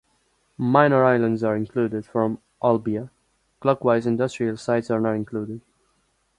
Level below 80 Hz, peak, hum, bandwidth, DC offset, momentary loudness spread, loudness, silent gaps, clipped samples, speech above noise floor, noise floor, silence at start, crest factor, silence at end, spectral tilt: -60 dBFS; -2 dBFS; none; 11 kHz; under 0.1%; 13 LU; -22 LUFS; none; under 0.1%; 46 dB; -67 dBFS; 0.6 s; 22 dB; 0.8 s; -7.5 dB/octave